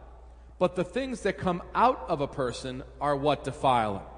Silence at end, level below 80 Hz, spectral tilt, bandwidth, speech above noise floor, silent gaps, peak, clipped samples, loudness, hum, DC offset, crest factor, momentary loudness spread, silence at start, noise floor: 0 s; -48 dBFS; -6 dB/octave; 10.5 kHz; 21 dB; none; -10 dBFS; under 0.1%; -28 LUFS; none; under 0.1%; 20 dB; 7 LU; 0 s; -49 dBFS